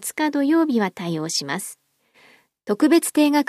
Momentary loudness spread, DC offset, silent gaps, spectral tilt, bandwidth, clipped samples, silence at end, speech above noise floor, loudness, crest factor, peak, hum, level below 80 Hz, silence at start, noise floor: 12 LU; under 0.1%; none; -4 dB/octave; 15 kHz; under 0.1%; 0.05 s; 37 dB; -21 LUFS; 16 dB; -6 dBFS; none; -74 dBFS; 0 s; -56 dBFS